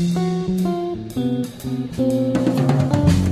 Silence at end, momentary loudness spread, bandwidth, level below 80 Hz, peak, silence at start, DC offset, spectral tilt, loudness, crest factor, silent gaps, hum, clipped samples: 0 s; 9 LU; 15 kHz; -34 dBFS; -2 dBFS; 0 s; under 0.1%; -7.5 dB/octave; -20 LUFS; 16 dB; none; none; under 0.1%